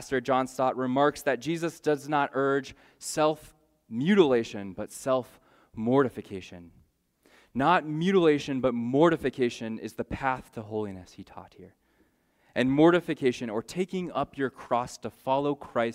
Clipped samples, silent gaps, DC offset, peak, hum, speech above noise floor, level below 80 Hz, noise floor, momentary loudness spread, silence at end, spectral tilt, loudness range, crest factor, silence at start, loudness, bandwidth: under 0.1%; none; under 0.1%; -8 dBFS; none; 40 dB; -60 dBFS; -68 dBFS; 16 LU; 0 s; -6 dB/octave; 4 LU; 20 dB; 0 s; -27 LUFS; 16 kHz